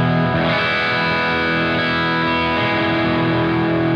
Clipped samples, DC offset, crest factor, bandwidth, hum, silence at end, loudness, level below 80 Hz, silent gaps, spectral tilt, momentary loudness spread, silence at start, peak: under 0.1%; under 0.1%; 10 dB; 6.8 kHz; none; 0 s; -17 LUFS; -46 dBFS; none; -7 dB/octave; 1 LU; 0 s; -6 dBFS